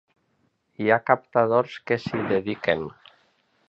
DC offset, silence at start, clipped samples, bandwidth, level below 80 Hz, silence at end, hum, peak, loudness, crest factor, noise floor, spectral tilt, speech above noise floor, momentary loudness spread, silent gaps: under 0.1%; 0.8 s; under 0.1%; 7.6 kHz; -60 dBFS; 0.8 s; none; -2 dBFS; -24 LUFS; 22 dB; -70 dBFS; -7.5 dB/octave; 46 dB; 7 LU; none